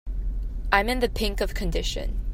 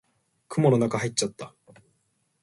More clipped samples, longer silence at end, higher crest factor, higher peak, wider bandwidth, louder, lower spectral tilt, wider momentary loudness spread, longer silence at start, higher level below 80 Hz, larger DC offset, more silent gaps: neither; second, 0 s vs 0.95 s; about the same, 22 dB vs 20 dB; first, -4 dBFS vs -8 dBFS; first, 16 kHz vs 11.5 kHz; about the same, -27 LUFS vs -25 LUFS; about the same, -4.5 dB/octave vs -5.5 dB/octave; second, 11 LU vs 20 LU; second, 0.05 s vs 0.5 s; first, -28 dBFS vs -66 dBFS; neither; neither